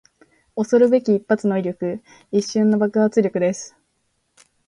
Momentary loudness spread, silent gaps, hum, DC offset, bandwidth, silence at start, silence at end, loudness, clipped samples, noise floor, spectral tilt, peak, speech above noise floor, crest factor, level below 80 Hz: 14 LU; none; none; under 0.1%; 10.5 kHz; 0.55 s; 1 s; -19 LUFS; under 0.1%; -69 dBFS; -6.5 dB/octave; -4 dBFS; 51 dB; 16 dB; -64 dBFS